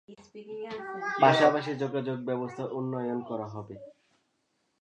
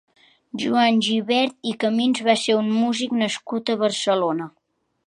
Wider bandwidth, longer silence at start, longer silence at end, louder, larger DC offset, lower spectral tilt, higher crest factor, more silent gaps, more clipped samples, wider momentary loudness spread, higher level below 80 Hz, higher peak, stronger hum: second, 9.6 kHz vs 11 kHz; second, 0.1 s vs 0.55 s; first, 0.9 s vs 0.55 s; second, -29 LUFS vs -21 LUFS; neither; first, -6 dB/octave vs -4 dB/octave; about the same, 22 dB vs 20 dB; neither; neither; first, 21 LU vs 8 LU; about the same, -74 dBFS vs -72 dBFS; second, -8 dBFS vs -2 dBFS; neither